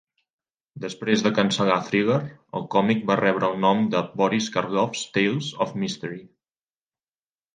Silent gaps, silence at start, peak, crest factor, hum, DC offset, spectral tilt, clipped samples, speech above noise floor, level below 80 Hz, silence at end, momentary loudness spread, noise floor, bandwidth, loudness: none; 0.75 s; -2 dBFS; 22 dB; none; under 0.1%; -5 dB/octave; under 0.1%; over 67 dB; -66 dBFS; 1.3 s; 12 LU; under -90 dBFS; 9.6 kHz; -23 LUFS